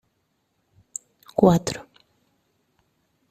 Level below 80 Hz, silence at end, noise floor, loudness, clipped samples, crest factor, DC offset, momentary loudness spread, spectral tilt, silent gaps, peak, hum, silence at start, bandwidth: -54 dBFS; 1.5 s; -72 dBFS; -21 LUFS; under 0.1%; 24 dB; under 0.1%; 19 LU; -6.5 dB/octave; none; -2 dBFS; none; 1.4 s; 14 kHz